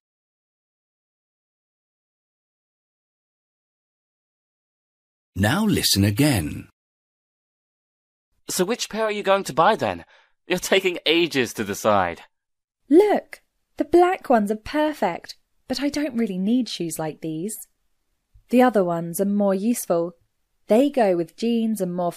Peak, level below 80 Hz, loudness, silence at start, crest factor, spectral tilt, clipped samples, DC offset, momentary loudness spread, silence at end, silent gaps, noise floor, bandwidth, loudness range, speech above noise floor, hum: -4 dBFS; -54 dBFS; -21 LUFS; 5.35 s; 20 dB; -4.5 dB/octave; under 0.1%; under 0.1%; 12 LU; 0 s; 6.73-8.32 s, 12.64-12.68 s; -78 dBFS; 15.5 kHz; 5 LU; 57 dB; none